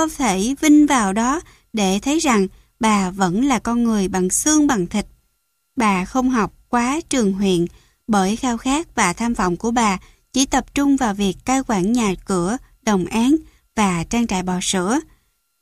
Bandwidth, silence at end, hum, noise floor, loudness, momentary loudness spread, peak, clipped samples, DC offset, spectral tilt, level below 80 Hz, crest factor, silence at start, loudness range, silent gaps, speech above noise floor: 15 kHz; 0.55 s; none; -69 dBFS; -19 LUFS; 7 LU; -2 dBFS; under 0.1%; under 0.1%; -4 dB/octave; -42 dBFS; 16 dB; 0 s; 3 LU; none; 51 dB